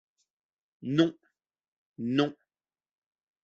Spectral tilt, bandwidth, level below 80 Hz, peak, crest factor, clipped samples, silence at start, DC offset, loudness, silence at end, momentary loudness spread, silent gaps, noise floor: -5.5 dB/octave; 7.4 kHz; -76 dBFS; -12 dBFS; 22 dB; under 0.1%; 0.8 s; under 0.1%; -29 LUFS; 1.1 s; 11 LU; 1.68-1.94 s; under -90 dBFS